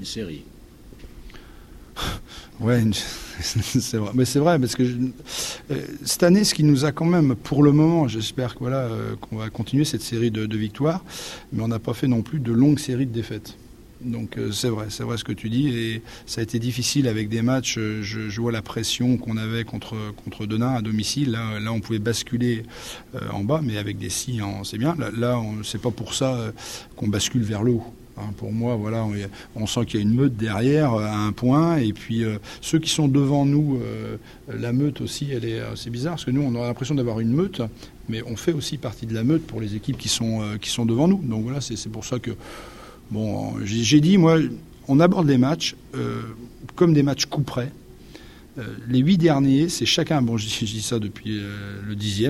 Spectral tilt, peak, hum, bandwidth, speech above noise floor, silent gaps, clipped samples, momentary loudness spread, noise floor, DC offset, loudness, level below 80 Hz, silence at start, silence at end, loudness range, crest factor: -5.5 dB/octave; -4 dBFS; none; 15.5 kHz; 21 dB; none; under 0.1%; 14 LU; -44 dBFS; under 0.1%; -23 LUFS; -48 dBFS; 0 s; 0 s; 6 LU; 20 dB